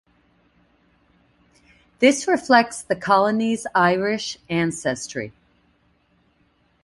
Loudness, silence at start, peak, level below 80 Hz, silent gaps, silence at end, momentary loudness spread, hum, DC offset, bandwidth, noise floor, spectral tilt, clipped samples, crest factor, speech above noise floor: -20 LUFS; 2 s; -2 dBFS; -60 dBFS; none; 1.55 s; 11 LU; 60 Hz at -50 dBFS; under 0.1%; 11.5 kHz; -63 dBFS; -4 dB/octave; under 0.1%; 20 dB; 43 dB